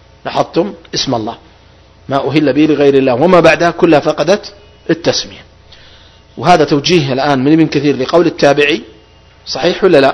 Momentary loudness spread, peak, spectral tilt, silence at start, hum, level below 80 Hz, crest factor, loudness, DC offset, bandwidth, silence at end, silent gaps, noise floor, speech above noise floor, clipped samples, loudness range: 10 LU; 0 dBFS; -5.5 dB/octave; 0.25 s; none; -44 dBFS; 12 dB; -11 LUFS; under 0.1%; 11 kHz; 0 s; none; -42 dBFS; 32 dB; 0.8%; 3 LU